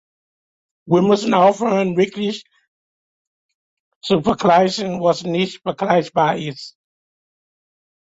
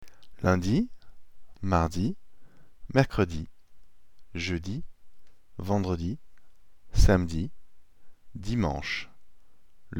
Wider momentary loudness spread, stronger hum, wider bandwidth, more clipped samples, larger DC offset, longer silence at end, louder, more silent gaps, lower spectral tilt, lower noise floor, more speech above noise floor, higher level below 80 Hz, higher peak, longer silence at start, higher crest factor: second, 12 LU vs 17 LU; neither; second, 8 kHz vs 17.5 kHz; neither; second, under 0.1% vs 0.7%; first, 1.5 s vs 0 s; first, -17 LUFS vs -29 LUFS; first, 2.68-4.01 s vs none; about the same, -6 dB/octave vs -6.5 dB/octave; first, under -90 dBFS vs -61 dBFS; first, over 73 dB vs 35 dB; second, -56 dBFS vs -36 dBFS; first, -2 dBFS vs -6 dBFS; first, 0.85 s vs 0 s; second, 18 dB vs 24 dB